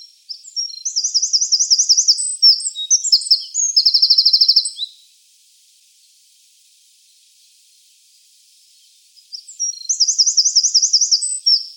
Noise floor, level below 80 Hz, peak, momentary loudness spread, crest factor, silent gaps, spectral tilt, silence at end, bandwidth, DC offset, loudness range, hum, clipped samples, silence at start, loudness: -53 dBFS; under -90 dBFS; -2 dBFS; 16 LU; 16 dB; none; 14 dB/octave; 0.05 s; 17 kHz; under 0.1%; 11 LU; none; under 0.1%; 0 s; -12 LUFS